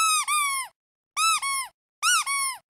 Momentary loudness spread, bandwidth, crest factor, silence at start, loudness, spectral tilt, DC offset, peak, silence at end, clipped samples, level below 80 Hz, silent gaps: 12 LU; 16 kHz; 16 dB; 0 s; -23 LUFS; 6 dB/octave; under 0.1%; -10 dBFS; 0.15 s; under 0.1%; -76 dBFS; 0.76-1.11 s, 1.74-2.02 s